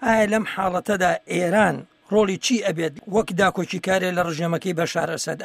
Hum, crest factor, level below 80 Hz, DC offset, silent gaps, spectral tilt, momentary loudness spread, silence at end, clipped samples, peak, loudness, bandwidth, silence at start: none; 18 dB; -54 dBFS; under 0.1%; none; -4.5 dB/octave; 5 LU; 0 s; under 0.1%; -4 dBFS; -22 LUFS; 16 kHz; 0 s